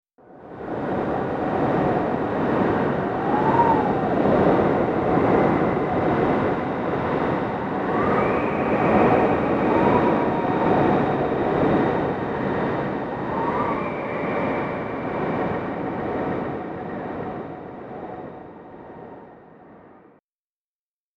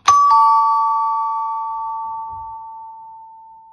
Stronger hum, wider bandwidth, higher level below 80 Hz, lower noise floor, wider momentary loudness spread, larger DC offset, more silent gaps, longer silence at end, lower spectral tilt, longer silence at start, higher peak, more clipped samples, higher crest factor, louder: neither; second, 7.8 kHz vs 11 kHz; first, -46 dBFS vs -58 dBFS; first, under -90 dBFS vs -41 dBFS; second, 15 LU vs 23 LU; neither; neither; first, 1.4 s vs 0.3 s; first, -9 dB/octave vs 0 dB/octave; first, 0.3 s vs 0.05 s; second, -4 dBFS vs 0 dBFS; neither; about the same, 18 dB vs 18 dB; second, -22 LUFS vs -16 LUFS